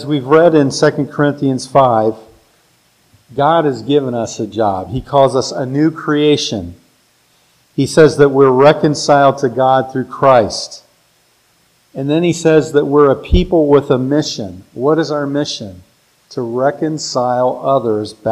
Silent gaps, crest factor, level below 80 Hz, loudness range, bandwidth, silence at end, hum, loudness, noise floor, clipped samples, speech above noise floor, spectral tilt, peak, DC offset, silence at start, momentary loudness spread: none; 14 dB; -32 dBFS; 6 LU; 12 kHz; 0 s; none; -13 LUFS; -55 dBFS; 0.2%; 42 dB; -6 dB/octave; 0 dBFS; under 0.1%; 0 s; 12 LU